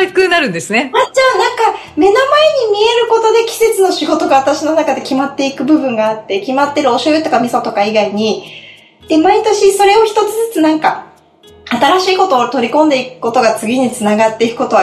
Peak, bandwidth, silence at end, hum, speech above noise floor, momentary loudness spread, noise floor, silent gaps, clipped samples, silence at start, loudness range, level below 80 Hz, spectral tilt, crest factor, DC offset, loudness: 0 dBFS; 14 kHz; 0 s; none; 31 dB; 6 LU; -42 dBFS; none; under 0.1%; 0 s; 3 LU; -52 dBFS; -3.5 dB/octave; 12 dB; under 0.1%; -12 LUFS